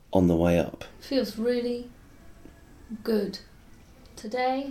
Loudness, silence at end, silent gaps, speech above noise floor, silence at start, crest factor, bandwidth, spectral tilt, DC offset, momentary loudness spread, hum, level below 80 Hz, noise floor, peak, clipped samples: -27 LUFS; 0 s; none; 25 dB; 0.1 s; 22 dB; 15 kHz; -7 dB/octave; under 0.1%; 20 LU; none; -50 dBFS; -51 dBFS; -8 dBFS; under 0.1%